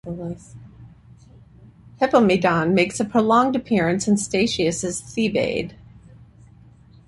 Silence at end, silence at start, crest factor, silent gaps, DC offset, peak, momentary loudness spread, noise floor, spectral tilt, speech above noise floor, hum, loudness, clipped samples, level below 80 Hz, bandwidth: 1.35 s; 0.05 s; 18 dB; none; under 0.1%; -4 dBFS; 13 LU; -49 dBFS; -5 dB/octave; 29 dB; none; -20 LUFS; under 0.1%; -52 dBFS; 11.5 kHz